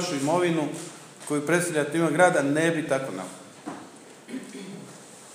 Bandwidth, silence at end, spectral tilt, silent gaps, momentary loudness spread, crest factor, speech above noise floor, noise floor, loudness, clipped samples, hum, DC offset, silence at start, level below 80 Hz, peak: 15.5 kHz; 0 s; -5 dB/octave; none; 22 LU; 20 dB; 22 dB; -46 dBFS; -24 LUFS; under 0.1%; none; under 0.1%; 0 s; -82 dBFS; -6 dBFS